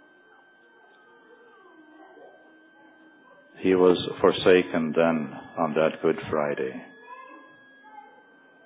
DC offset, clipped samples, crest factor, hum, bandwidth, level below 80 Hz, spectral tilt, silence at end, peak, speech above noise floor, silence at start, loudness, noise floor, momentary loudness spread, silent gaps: under 0.1%; under 0.1%; 22 dB; none; 4 kHz; -62 dBFS; -10 dB/octave; 0.65 s; -4 dBFS; 33 dB; 3.55 s; -24 LUFS; -56 dBFS; 24 LU; none